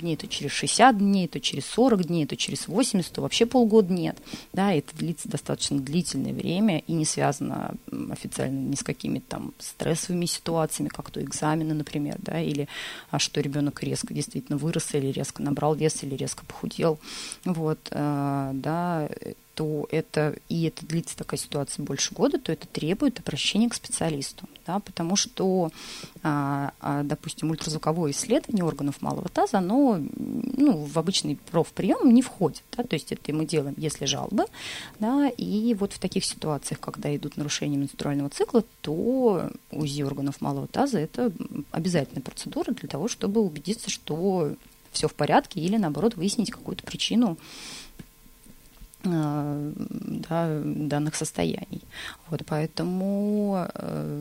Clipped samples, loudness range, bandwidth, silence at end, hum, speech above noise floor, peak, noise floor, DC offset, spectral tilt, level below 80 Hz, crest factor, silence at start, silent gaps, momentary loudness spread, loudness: under 0.1%; 5 LU; 16 kHz; 0 s; none; 25 dB; -4 dBFS; -51 dBFS; under 0.1%; -5 dB/octave; -56 dBFS; 22 dB; 0 s; none; 10 LU; -27 LUFS